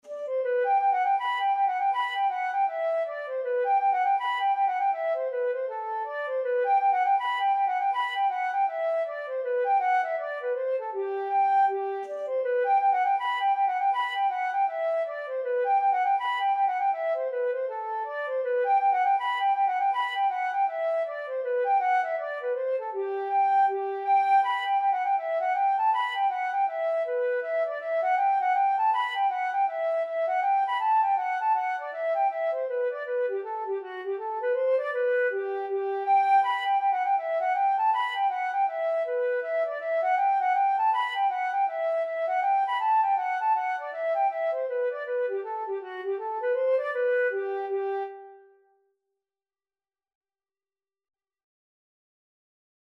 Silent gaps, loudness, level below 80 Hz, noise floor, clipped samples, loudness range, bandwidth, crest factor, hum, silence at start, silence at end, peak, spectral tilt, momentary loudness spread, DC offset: none; -26 LUFS; under -90 dBFS; under -90 dBFS; under 0.1%; 3 LU; 6.2 kHz; 12 dB; none; 0.05 s; 4.55 s; -14 dBFS; -0.5 dB/octave; 7 LU; under 0.1%